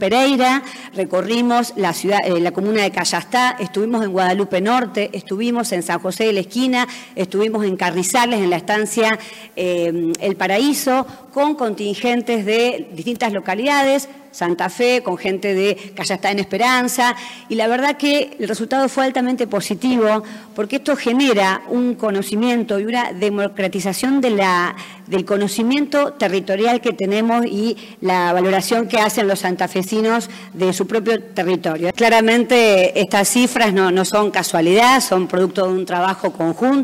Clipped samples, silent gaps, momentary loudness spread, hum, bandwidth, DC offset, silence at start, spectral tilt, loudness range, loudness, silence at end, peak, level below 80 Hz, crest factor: under 0.1%; none; 7 LU; none; 16 kHz; under 0.1%; 0 s; -4 dB/octave; 4 LU; -17 LUFS; 0 s; -2 dBFS; -62 dBFS; 14 dB